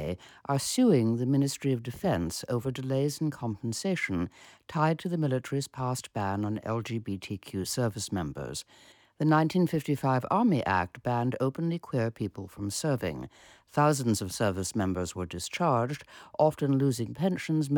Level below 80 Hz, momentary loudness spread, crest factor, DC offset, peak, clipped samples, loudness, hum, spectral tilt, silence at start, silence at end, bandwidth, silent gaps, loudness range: -58 dBFS; 11 LU; 18 dB; under 0.1%; -10 dBFS; under 0.1%; -30 LUFS; none; -6 dB/octave; 0 s; 0 s; 19 kHz; none; 4 LU